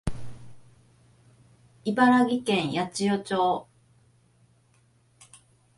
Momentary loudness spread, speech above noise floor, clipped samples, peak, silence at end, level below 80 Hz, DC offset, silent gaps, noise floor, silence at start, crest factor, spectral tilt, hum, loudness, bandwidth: 16 LU; 39 dB; under 0.1%; -8 dBFS; 2.15 s; -52 dBFS; under 0.1%; none; -63 dBFS; 0.05 s; 20 dB; -5 dB/octave; none; -25 LUFS; 11.5 kHz